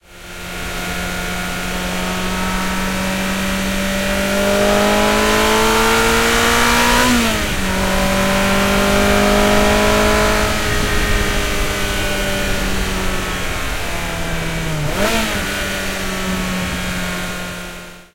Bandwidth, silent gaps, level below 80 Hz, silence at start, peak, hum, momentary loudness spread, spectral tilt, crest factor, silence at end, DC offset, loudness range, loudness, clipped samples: 16.5 kHz; none; -26 dBFS; 0.1 s; -2 dBFS; none; 9 LU; -3.5 dB/octave; 16 dB; 0.1 s; under 0.1%; 7 LU; -16 LUFS; under 0.1%